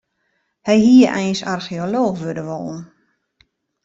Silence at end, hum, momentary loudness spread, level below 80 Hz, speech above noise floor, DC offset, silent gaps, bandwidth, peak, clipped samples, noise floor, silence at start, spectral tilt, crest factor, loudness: 1 s; none; 17 LU; -58 dBFS; 53 dB; under 0.1%; none; 7.8 kHz; -2 dBFS; under 0.1%; -69 dBFS; 0.65 s; -6 dB/octave; 16 dB; -17 LUFS